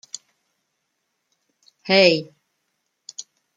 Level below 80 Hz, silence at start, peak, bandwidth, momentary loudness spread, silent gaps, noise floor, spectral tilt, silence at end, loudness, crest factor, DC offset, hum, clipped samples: -72 dBFS; 1.85 s; -2 dBFS; 9 kHz; 23 LU; none; -75 dBFS; -4 dB/octave; 0.35 s; -17 LUFS; 24 dB; under 0.1%; none; under 0.1%